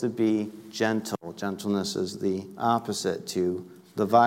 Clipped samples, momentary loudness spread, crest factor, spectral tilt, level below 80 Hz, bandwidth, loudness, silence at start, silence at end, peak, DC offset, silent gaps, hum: under 0.1%; 8 LU; 18 dB; -5 dB/octave; -70 dBFS; 16.5 kHz; -28 LUFS; 0 s; 0 s; -8 dBFS; under 0.1%; none; none